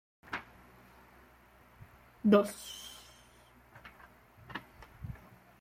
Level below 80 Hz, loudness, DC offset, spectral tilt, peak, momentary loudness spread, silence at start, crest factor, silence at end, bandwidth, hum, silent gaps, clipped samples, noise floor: -64 dBFS; -33 LUFS; under 0.1%; -6 dB/octave; -14 dBFS; 30 LU; 0.3 s; 24 dB; 0.45 s; 16 kHz; none; none; under 0.1%; -61 dBFS